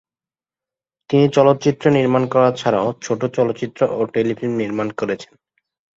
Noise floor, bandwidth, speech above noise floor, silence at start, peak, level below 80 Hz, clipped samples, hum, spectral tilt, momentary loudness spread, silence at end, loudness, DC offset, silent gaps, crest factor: under -90 dBFS; 8 kHz; over 73 dB; 1.1 s; -2 dBFS; -60 dBFS; under 0.1%; none; -6.5 dB/octave; 8 LU; 0.7 s; -18 LUFS; under 0.1%; none; 18 dB